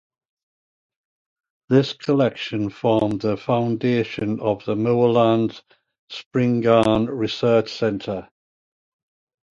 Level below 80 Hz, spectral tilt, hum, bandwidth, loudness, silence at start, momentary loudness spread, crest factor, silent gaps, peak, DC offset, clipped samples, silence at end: -54 dBFS; -7.5 dB/octave; none; 10 kHz; -21 LUFS; 1.7 s; 10 LU; 20 dB; 5.99-6.08 s, 6.26-6.31 s; -2 dBFS; under 0.1%; under 0.1%; 1.35 s